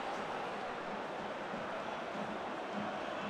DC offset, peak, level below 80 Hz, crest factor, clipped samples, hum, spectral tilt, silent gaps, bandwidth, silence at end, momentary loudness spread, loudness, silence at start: under 0.1%; -28 dBFS; -72 dBFS; 14 dB; under 0.1%; none; -5 dB/octave; none; 14 kHz; 0 s; 1 LU; -41 LUFS; 0 s